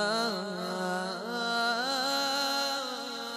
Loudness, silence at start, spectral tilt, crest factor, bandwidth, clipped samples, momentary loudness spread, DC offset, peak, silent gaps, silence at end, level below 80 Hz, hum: -30 LUFS; 0 s; -2.5 dB/octave; 14 dB; 13.5 kHz; under 0.1%; 6 LU; under 0.1%; -18 dBFS; none; 0 s; -80 dBFS; none